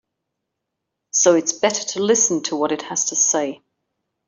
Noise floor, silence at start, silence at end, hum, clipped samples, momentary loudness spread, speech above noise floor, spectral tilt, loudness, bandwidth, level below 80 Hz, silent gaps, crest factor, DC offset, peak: -80 dBFS; 1.15 s; 0.7 s; none; under 0.1%; 7 LU; 61 dB; -2 dB/octave; -18 LUFS; 8.2 kHz; -70 dBFS; none; 18 dB; under 0.1%; -2 dBFS